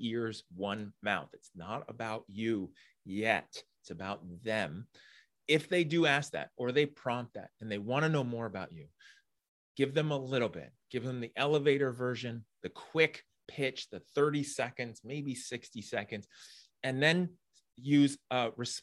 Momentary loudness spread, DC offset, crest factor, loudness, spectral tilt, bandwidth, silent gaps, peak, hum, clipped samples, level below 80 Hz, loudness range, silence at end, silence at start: 18 LU; under 0.1%; 22 dB; -34 LUFS; -5 dB/octave; 12.5 kHz; 9.48-9.75 s; -12 dBFS; none; under 0.1%; -76 dBFS; 5 LU; 0 s; 0 s